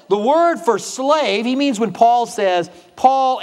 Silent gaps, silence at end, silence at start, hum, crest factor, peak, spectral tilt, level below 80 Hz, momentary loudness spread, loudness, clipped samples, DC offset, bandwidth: none; 0 s; 0.1 s; none; 16 dB; 0 dBFS; -4 dB/octave; -68 dBFS; 5 LU; -16 LUFS; under 0.1%; under 0.1%; 13.5 kHz